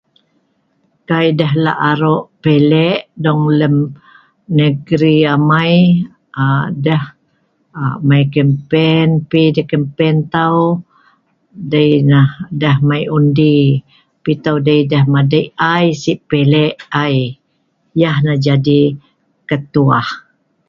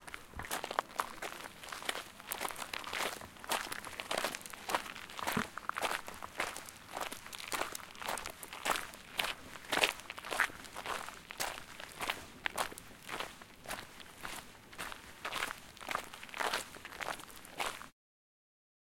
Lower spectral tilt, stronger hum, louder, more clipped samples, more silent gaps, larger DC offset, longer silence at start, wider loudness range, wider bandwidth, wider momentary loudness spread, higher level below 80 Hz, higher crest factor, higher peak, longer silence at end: first, -8 dB/octave vs -1.5 dB/octave; neither; first, -13 LUFS vs -40 LUFS; neither; neither; neither; first, 1.1 s vs 0 s; second, 2 LU vs 6 LU; second, 7.2 kHz vs 17 kHz; about the same, 8 LU vs 10 LU; first, -50 dBFS vs -64 dBFS; second, 14 dB vs 34 dB; first, 0 dBFS vs -8 dBFS; second, 0.5 s vs 1 s